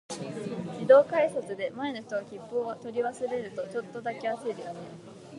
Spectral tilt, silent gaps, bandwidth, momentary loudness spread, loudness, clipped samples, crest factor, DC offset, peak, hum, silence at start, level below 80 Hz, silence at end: -5.5 dB/octave; none; 11.5 kHz; 17 LU; -29 LUFS; under 0.1%; 22 dB; under 0.1%; -8 dBFS; none; 0.1 s; -74 dBFS; 0 s